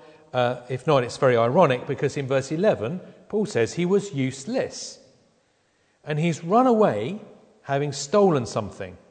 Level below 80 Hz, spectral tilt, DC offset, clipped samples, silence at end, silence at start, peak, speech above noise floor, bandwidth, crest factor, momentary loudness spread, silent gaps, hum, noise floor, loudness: -64 dBFS; -6 dB/octave; under 0.1%; under 0.1%; 0.15 s; 0.35 s; -4 dBFS; 43 dB; 9.4 kHz; 20 dB; 13 LU; none; none; -65 dBFS; -23 LUFS